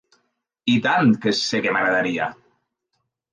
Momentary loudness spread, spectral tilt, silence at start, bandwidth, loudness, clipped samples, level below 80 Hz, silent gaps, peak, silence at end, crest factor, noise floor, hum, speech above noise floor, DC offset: 9 LU; -5 dB/octave; 0.65 s; 9.6 kHz; -20 LUFS; under 0.1%; -66 dBFS; none; -6 dBFS; 1 s; 16 dB; -75 dBFS; none; 56 dB; under 0.1%